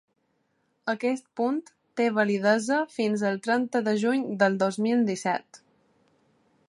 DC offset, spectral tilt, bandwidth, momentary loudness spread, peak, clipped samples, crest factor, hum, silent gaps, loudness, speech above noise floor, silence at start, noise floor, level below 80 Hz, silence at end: under 0.1%; -5.5 dB/octave; 11.5 kHz; 7 LU; -8 dBFS; under 0.1%; 20 dB; none; none; -26 LUFS; 47 dB; 0.85 s; -72 dBFS; -78 dBFS; 1.1 s